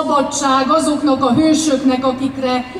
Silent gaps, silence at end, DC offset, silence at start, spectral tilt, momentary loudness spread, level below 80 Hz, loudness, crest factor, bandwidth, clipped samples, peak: none; 0 s; under 0.1%; 0 s; -4 dB/octave; 5 LU; -46 dBFS; -15 LUFS; 12 dB; 13 kHz; under 0.1%; -4 dBFS